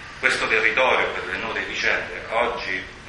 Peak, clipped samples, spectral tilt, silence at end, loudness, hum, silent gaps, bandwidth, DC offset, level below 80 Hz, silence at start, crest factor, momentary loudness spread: -2 dBFS; under 0.1%; -2.5 dB/octave; 0 s; -21 LUFS; none; none; 11.5 kHz; under 0.1%; -48 dBFS; 0 s; 22 dB; 9 LU